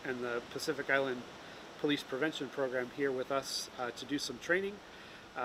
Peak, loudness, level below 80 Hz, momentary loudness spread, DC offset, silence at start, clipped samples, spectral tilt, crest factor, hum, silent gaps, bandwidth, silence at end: -16 dBFS; -36 LUFS; -72 dBFS; 16 LU; under 0.1%; 0 s; under 0.1%; -3.5 dB/octave; 20 dB; none; none; 16 kHz; 0 s